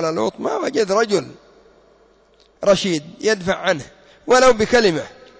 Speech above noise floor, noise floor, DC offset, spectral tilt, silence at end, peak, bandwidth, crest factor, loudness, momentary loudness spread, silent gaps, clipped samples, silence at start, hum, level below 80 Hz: 37 dB; -54 dBFS; under 0.1%; -4 dB/octave; 0.3 s; -4 dBFS; 8 kHz; 14 dB; -18 LUFS; 10 LU; none; under 0.1%; 0 s; none; -48 dBFS